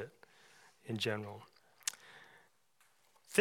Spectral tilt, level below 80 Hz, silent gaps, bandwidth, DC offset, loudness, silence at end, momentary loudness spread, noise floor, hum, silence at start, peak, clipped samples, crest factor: -3 dB/octave; under -90 dBFS; none; 18 kHz; under 0.1%; -40 LUFS; 0 s; 24 LU; -74 dBFS; none; 0 s; -12 dBFS; under 0.1%; 30 dB